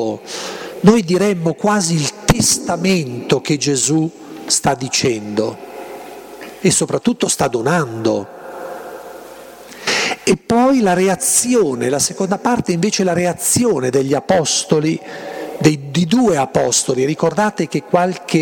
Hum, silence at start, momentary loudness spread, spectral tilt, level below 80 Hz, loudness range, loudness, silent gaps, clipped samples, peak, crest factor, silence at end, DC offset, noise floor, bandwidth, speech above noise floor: none; 0 s; 18 LU; -4 dB/octave; -44 dBFS; 4 LU; -16 LUFS; none; under 0.1%; 0 dBFS; 16 dB; 0 s; under 0.1%; -36 dBFS; 17.5 kHz; 20 dB